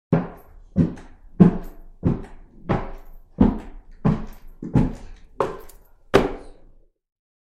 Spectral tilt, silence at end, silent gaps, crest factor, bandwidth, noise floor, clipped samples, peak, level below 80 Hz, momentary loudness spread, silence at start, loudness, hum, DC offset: -8.5 dB/octave; 1 s; none; 22 dB; 13.5 kHz; -50 dBFS; under 0.1%; 0 dBFS; -36 dBFS; 24 LU; 0.1 s; -23 LUFS; none; under 0.1%